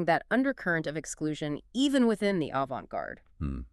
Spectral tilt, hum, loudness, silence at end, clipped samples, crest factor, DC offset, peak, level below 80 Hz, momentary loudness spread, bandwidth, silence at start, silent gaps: -5 dB/octave; none; -30 LUFS; 0.05 s; under 0.1%; 18 dB; under 0.1%; -12 dBFS; -50 dBFS; 12 LU; 12.5 kHz; 0 s; none